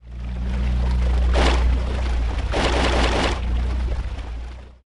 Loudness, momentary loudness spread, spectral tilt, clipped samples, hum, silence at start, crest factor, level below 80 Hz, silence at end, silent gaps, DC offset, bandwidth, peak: -22 LUFS; 13 LU; -5.5 dB/octave; under 0.1%; none; 0.05 s; 14 dB; -22 dBFS; 0.15 s; none; under 0.1%; 11 kHz; -6 dBFS